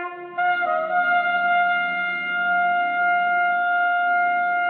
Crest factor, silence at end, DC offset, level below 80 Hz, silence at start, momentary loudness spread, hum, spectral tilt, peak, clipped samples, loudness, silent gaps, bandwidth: 10 dB; 0 s; under 0.1%; -76 dBFS; 0 s; 3 LU; none; -7 dB/octave; -10 dBFS; under 0.1%; -21 LUFS; none; 4.5 kHz